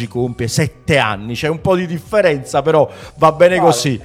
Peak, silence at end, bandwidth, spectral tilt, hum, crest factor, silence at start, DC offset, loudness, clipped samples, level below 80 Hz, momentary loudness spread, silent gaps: 0 dBFS; 0 s; 15.5 kHz; -5 dB/octave; none; 14 dB; 0 s; under 0.1%; -15 LUFS; under 0.1%; -44 dBFS; 9 LU; none